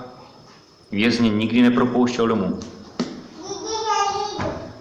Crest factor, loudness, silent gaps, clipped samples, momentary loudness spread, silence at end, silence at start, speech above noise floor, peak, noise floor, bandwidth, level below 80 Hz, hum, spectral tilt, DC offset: 18 dB; -21 LUFS; none; under 0.1%; 15 LU; 0 s; 0 s; 30 dB; -4 dBFS; -48 dBFS; 8.2 kHz; -50 dBFS; none; -5 dB/octave; under 0.1%